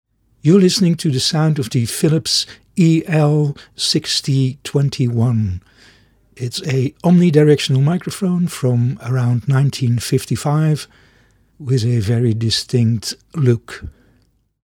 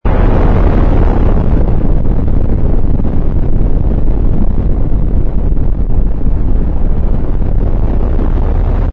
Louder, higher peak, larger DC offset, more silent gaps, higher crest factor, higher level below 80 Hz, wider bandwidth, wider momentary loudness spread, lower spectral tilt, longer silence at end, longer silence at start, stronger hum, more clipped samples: about the same, -16 LUFS vs -15 LUFS; about the same, 0 dBFS vs 0 dBFS; neither; neither; first, 16 dB vs 8 dB; second, -50 dBFS vs -10 dBFS; first, 17 kHz vs 3.2 kHz; first, 10 LU vs 5 LU; second, -6 dB/octave vs -11 dB/octave; first, 0.75 s vs 0 s; first, 0.45 s vs 0.05 s; neither; neither